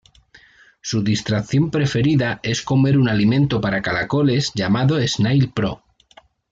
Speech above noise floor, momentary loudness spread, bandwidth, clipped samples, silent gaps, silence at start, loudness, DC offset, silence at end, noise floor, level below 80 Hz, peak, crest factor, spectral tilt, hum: 34 dB; 7 LU; 7.8 kHz; under 0.1%; none; 0.85 s; -19 LUFS; under 0.1%; 0.75 s; -52 dBFS; -48 dBFS; -6 dBFS; 12 dB; -6 dB/octave; none